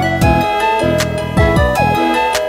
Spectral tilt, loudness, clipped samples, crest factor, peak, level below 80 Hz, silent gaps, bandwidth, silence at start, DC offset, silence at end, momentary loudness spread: -5.5 dB/octave; -13 LUFS; under 0.1%; 14 dB; 0 dBFS; -24 dBFS; none; 16 kHz; 0 s; under 0.1%; 0 s; 3 LU